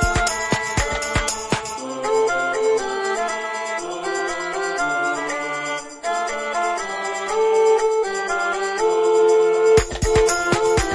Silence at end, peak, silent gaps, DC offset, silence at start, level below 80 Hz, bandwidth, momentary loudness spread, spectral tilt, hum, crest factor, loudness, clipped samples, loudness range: 0 s; -2 dBFS; none; under 0.1%; 0 s; -36 dBFS; 11.5 kHz; 9 LU; -3.5 dB/octave; none; 18 dB; -20 LUFS; under 0.1%; 6 LU